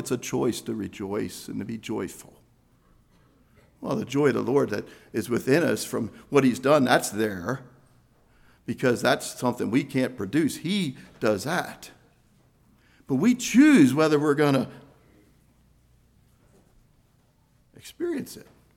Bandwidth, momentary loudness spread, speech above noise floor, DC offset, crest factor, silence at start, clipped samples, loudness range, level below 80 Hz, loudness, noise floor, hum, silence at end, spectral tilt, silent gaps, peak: 17 kHz; 15 LU; 39 dB; under 0.1%; 20 dB; 0 s; under 0.1%; 12 LU; -62 dBFS; -25 LUFS; -63 dBFS; none; 0.35 s; -5.5 dB/octave; none; -6 dBFS